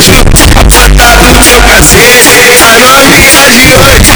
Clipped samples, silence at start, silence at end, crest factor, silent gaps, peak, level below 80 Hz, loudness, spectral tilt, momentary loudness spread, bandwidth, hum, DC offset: 90%; 0 s; 0 s; 0 dB; none; 0 dBFS; -8 dBFS; 1 LUFS; -2.5 dB/octave; 3 LU; over 20 kHz; none; 2%